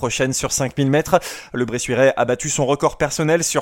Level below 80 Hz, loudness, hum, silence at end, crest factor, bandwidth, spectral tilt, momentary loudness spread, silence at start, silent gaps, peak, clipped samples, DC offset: -44 dBFS; -19 LUFS; none; 0 s; 18 dB; 17 kHz; -4 dB/octave; 6 LU; 0 s; none; 0 dBFS; under 0.1%; under 0.1%